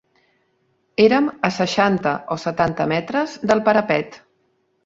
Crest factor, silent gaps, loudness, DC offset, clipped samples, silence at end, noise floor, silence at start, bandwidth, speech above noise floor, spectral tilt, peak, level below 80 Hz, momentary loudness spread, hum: 18 dB; none; -19 LUFS; under 0.1%; under 0.1%; 0.7 s; -66 dBFS; 1 s; 7.8 kHz; 47 dB; -5.5 dB/octave; -2 dBFS; -56 dBFS; 8 LU; none